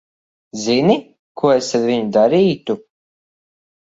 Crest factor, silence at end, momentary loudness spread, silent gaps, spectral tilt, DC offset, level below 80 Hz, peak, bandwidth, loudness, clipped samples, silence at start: 18 dB; 1.2 s; 11 LU; 1.19-1.35 s; -5.5 dB/octave; under 0.1%; -60 dBFS; 0 dBFS; 8 kHz; -17 LUFS; under 0.1%; 0.55 s